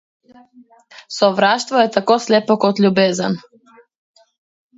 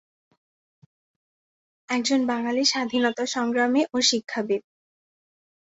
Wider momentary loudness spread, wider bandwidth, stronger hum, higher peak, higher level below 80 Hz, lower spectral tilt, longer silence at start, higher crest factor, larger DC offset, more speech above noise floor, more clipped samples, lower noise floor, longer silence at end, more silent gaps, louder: about the same, 8 LU vs 6 LU; about the same, 8 kHz vs 8 kHz; neither; first, 0 dBFS vs -8 dBFS; first, -66 dBFS vs -72 dBFS; first, -5 dB/octave vs -2 dB/octave; second, 1.1 s vs 1.9 s; about the same, 18 dB vs 18 dB; neither; second, 34 dB vs over 67 dB; neither; second, -50 dBFS vs under -90 dBFS; first, 1.4 s vs 1.2 s; neither; first, -16 LUFS vs -23 LUFS